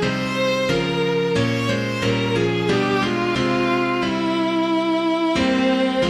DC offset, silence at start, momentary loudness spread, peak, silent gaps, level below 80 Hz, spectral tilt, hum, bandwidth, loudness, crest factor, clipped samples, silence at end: under 0.1%; 0 s; 2 LU; -8 dBFS; none; -46 dBFS; -5.5 dB/octave; none; 13.5 kHz; -20 LUFS; 12 dB; under 0.1%; 0 s